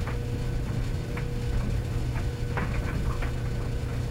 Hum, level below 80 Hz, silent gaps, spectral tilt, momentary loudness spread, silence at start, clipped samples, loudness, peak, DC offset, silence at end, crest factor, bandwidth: none; -32 dBFS; none; -6.5 dB/octave; 2 LU; 0 s; under 0.1%; -31 LUFS; -14 dBFS; under 0.1%; 0 s; 14 dB; 15.5 kHz